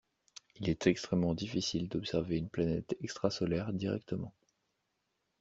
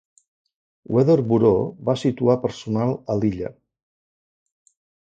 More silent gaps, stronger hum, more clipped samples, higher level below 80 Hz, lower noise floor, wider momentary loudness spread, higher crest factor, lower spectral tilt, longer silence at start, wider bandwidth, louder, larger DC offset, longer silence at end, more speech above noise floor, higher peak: neither; neither; neither; second, -60 dBFS vs -52 dBFS; second, -82 dBFS vs under -90 dBFS; about the same, 10 LU vs 8 LU; about the same, 22 dB vs 18 dB; second, -6 dB/octave vs -8.5 dB/octave; second, 0.6 s vs 0.9 s; about the same, 8 kHz vs 8.8 kHz; second, -35 LUFS vs -21 LUFS; neither; second, 1.1 s vs 1.5 s; second, 48 dB vs over 70 dB; second, -14 dBFS vs -4 dBFS